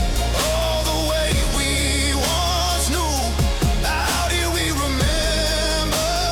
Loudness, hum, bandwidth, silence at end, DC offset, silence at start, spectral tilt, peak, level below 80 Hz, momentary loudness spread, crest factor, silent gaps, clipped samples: -20 LUFS; none; 18 kHz; 0 s; under 0.1%; 0 s; -3.5 dB/octave; -8 dBFS; -24 dBFS; 2 LU; 12 dB; none; under 0.1%